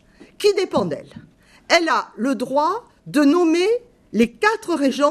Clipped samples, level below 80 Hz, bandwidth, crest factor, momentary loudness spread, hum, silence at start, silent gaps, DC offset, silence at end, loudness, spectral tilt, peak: under 0.1%; -58 dBFS; 13.5 kHz; 18 dB; 8 LU; none; 0.4 s; none; under 0.1%; 0 s; -19 LUFS; -4 dB/octave; -2 dBFS